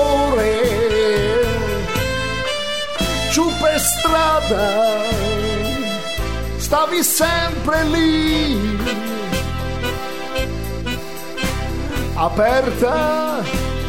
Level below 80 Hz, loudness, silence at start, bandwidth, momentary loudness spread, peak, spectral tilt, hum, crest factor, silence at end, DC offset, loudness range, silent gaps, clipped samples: -30 dBFS; -18 LUFS; 0 s; 16.5 kHz; 8 LU; -2 dBFS; -4 dB/octave; none; 16 dB; 0 s; 2%; 5 LU; none; under 0.1%